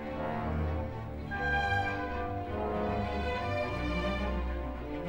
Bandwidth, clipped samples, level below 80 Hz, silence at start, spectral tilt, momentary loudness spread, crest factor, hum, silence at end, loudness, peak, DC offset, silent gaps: 16.5 kHz; under 0.1%; -40 dBFS; 0 s; -7 dB/octave; 7 LU; 16 dB; none; 0 s; -34 LUFS; -18 dBFS; under 0.1%; none